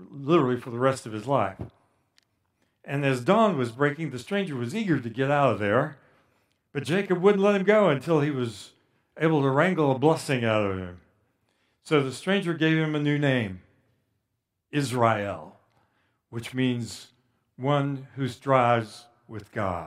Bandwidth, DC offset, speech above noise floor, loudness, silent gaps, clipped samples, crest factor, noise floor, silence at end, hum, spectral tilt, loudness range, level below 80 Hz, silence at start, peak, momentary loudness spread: 14 kHz; under 0.1%; 55 dB; -25 LUFS; none; under 0.1%; 20 dB; -80 dBFS; 0 s; none; -6.5 dB/octave; 6 LU; -66 dBFS; 0 s; -6 dBFS; 14 LU